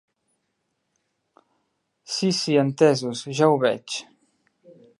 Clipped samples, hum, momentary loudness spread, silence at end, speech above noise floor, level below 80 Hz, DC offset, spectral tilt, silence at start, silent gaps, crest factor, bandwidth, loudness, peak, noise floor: under 0.1%; none; 11 LU; 0.95 s; 55 dB; -78 dBFS; under 0.1%; -5 dB/octave; 2.1 s; none; 22 dB; 11.5 kHz; -22 LUFS; -4 dBFS; -75 dBFS